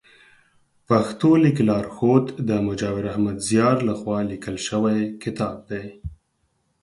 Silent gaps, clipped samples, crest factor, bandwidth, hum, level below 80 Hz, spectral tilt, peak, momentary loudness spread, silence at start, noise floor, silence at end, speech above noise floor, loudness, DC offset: none; under 0.1%; 18 dB; 11.5 kHz; none; -50 dBFS; -6.5 dB/octave; -4 dBFS; 13 LU; 0.9 s; -69 dBFS; 0.7 s; 48 dB; -22 LUFS; under 0.1%